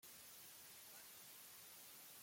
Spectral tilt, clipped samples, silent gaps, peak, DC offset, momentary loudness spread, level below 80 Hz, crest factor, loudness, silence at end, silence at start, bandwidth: 0 dB/octave; under 0.1%; none; -48 dBFS; under 0.1%; 0 LU; under -90 dBFS; 14 dB; -57 LUFS; 0 s; 0 s; 16.5 kHz